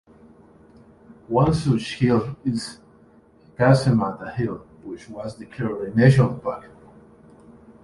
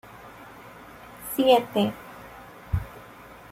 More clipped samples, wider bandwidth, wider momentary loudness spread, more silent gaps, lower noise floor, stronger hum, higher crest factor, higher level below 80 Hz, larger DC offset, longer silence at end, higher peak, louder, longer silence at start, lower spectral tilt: neither; second, 11.5 kHz vs 16.5 kHz; second, 19 LU vs 25 LU; neither; first, -53 dBFS vs -46 dBFS; neither; about the same, 20 dB vs 22 dB; about the same, -48 dBFS vs -46 dBFS; neither; first, 1.15 s vs 0.45 s; about the same, -4 dBFS vs -6 dBFS; first, -21 LUFS vs -24 LUFS; first, 1.1 s vs 0.15 s; first, -7.5 dB/octave vs -5.5 dB/octave